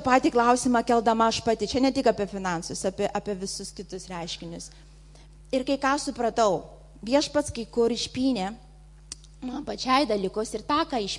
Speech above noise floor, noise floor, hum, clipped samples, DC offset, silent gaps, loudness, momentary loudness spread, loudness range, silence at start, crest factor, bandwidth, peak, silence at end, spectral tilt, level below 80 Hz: 24 dB; -49 dBFS; none; under 0.1%; under 0.1%; none; -26 LUFS; 16 LU; 7 LU; 0 s; 20 dB; 11.5 kHz; -6 dBFS; 0 s; -4 dB/octave; -50 dBFS